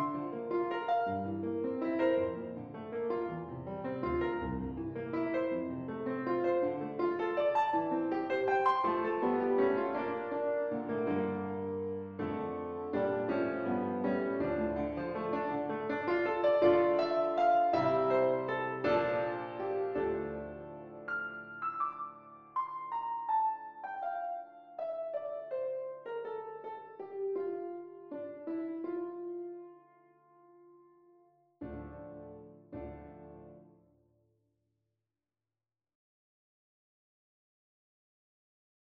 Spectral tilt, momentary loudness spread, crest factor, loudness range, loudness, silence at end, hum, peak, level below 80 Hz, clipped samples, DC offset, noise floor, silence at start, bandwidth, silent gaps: -5.5 dB/octave; 16 LU; 20 dB; 19 LU; -34 LUFS; 5.2 s; none; -16 dBFS; -62 dBFS; under 0.1%; under 0.1%; under -90 dBFS; 0 s; 6.6 kHz; none